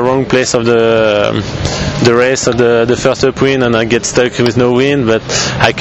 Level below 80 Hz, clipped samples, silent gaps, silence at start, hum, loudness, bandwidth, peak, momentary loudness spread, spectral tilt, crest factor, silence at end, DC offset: -34 dBFS; 0.1%; none; 0 s; none; -11 LUFS; 8.4 kHz; 0 dBFS; 4 LU; -4.5 dB/octave; 10 dB; 0 s; under 0.1%